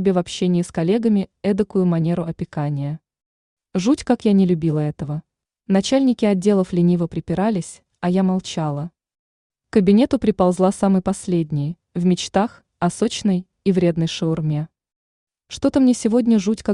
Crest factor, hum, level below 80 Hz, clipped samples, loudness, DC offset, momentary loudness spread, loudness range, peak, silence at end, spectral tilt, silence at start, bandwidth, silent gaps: 16 dB; none; -52 dBFS; under 0.1%; -20 LUFS; under 0.1%; 10 LU; 3 LU; -4 dBFS; 0 s; -7 dB/octave; 0 s; 11 kHz; 3.26-3.57 s, 9.19-9.50 s, 14.96-15.27 s